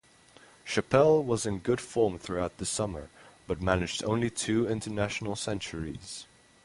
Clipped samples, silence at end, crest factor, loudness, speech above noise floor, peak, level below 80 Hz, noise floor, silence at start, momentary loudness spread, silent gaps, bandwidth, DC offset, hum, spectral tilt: under 0.1%; 0.4 s; 22 dB; -29 LUFS; 28 dB; -8 dBFS; -50 dBFS; -57 dBFS; 0.65 s; 15 LU; none; 11.5 kHz; under 0.1%; none; -5 dB/octave